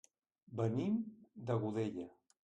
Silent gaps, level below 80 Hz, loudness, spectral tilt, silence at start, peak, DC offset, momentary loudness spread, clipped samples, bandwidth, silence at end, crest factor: none; -76 dBFS; -40 LUFS; -8.5 dB/octave; 0.5 s; -24 dBFS; under 0.1%; 12 LU; under 0.1%; 9 kHz; 0.35 s; 16 dB